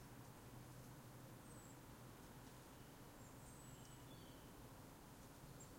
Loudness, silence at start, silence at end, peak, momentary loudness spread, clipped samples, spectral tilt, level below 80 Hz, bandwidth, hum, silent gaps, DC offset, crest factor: -60 LUFS; 0 s; 0 s; -46 dBFS; 1 LU; under 0.1%; -4.5 dB/octave; -70 dBFS; 16.5 kHz; none; none; under 0.1%; 14 dB